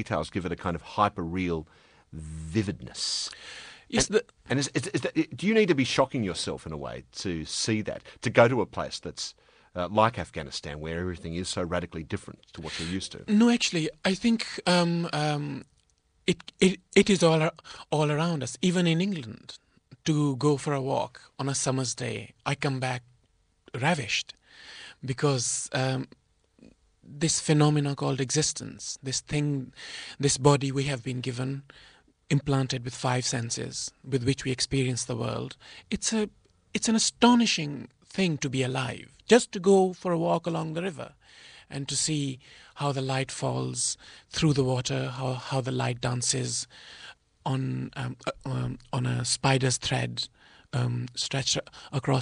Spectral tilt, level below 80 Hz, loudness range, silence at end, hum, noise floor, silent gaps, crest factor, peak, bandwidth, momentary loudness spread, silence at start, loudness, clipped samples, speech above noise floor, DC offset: -4.5 dB/octave; -56 dBFS; 5 LU; 0 s; none; -68 dBFS; none; 24 dB; -6 dBFS; 10.5 kHz; 15 LU; 0 s; -28 LUFS; under 0.1%; 40 dB; under 0.1%